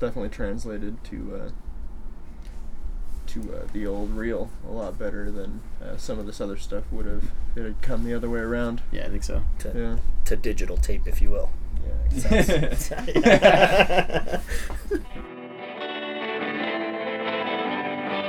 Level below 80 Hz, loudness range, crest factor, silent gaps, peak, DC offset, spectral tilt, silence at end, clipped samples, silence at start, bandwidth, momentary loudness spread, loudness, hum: -28 dBFS; 14 LU; 22 dB; none; 0 dBFS; under 0.1%; -5 dB/octave; 0 s; under 0.1%; 0 s; 14 kHz; 18 LU; -26 LUFS; none